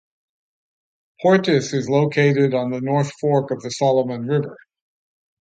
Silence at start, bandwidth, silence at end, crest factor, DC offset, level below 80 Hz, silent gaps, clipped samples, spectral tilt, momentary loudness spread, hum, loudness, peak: 1.2 s; 9 kHz; 0.85 s; 18 dB; under 0.1%; -66 dBFS; none; under 0.1%; -6.5 dB/octave; 6 LU; none; -19 LUFS; -2 dBFS